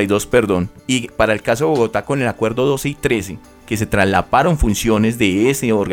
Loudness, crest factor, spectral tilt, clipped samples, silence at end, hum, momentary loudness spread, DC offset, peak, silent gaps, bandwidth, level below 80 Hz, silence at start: -17 LUFS; 16 dB; -5 dB/octave; under 0.1%; 0 s; none; 6 LU; under 0.1%; 0 dBFS; none; 17.5 kHz; -32 dBFS; 0 s